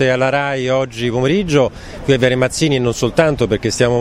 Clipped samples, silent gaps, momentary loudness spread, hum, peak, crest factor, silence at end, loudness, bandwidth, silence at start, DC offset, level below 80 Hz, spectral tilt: under 0.1%; none; 4 LU; none; 0 dBFS; 14 dB; 0 s; -16 LUFS; 15 kHz; 0 s; under 0.1%; -38 dBFS; -5 dB/octave